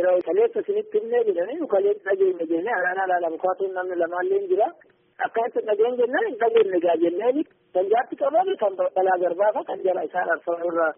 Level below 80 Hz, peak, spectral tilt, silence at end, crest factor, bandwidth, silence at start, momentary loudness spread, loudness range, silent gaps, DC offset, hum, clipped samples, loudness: -78 dBFS; -8 dBFS; 1.5 dB/octave; 0.05 s; 14 dB; 3.7 kHz; 0 s; 5 LU; 2 LU; none; under 0.1%; none; under 0.1%; -23 LUFS